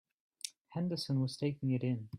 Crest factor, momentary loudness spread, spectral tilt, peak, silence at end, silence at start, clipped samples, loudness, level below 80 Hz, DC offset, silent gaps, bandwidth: 20 dB; 11 LU; -6.5 dB/octave; -16 dBFS; 0 s; 0.45 s; under 0.1%; -37 LUFS; -74 dBFS; under 0.1%; 0.61-0.65 s; 14 kHz